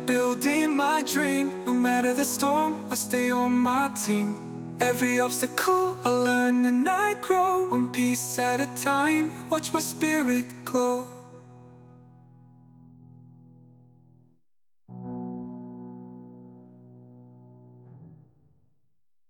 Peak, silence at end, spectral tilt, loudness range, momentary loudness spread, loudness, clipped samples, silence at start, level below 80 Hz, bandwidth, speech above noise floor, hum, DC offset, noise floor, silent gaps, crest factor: -10 dBFS; 1.15 s; -4 dB/octave; 19 LU; 15 LU; -25 LUFS; under 0.1%; 0 s; -70 dBFS; 19 kHz; 57 dB; none; under 0.1%; -82 dBFS; none; 16 dB